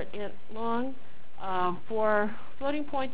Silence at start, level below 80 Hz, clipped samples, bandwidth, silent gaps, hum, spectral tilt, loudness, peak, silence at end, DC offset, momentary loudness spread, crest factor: 0 s; -60 dBFS; under 0.1%; 4 kHz; none; none; -9 dB/octave; -32 LUFS; -14 dBFS; 0 s; 4%; 13 LU; 20 dB